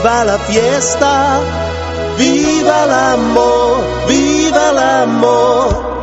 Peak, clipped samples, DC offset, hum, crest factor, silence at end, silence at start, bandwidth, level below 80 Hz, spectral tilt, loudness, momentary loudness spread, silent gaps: 0 dBFS; under 0.1%; under 0.1%; none; 12 dB; 0 s; 0 s; 8.2 kHz; -30 dBFS; -4 dB/octave; -11 LUFS; 5 LU; none